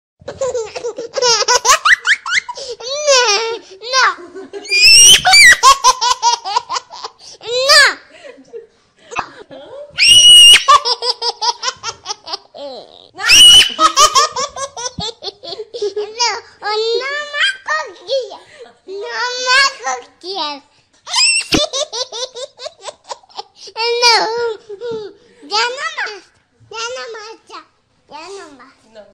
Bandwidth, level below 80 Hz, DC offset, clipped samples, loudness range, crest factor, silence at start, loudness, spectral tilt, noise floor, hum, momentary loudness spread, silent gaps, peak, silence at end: 16 kHz; -46 dBFS; under 0.1%; under 0.1%; 11 LU; 14 dB; 0.25 s; -9 LUFS; 1 dB/octave; -52 dBFS; none; 26 LU; none; 0 dBFS; 0.1 s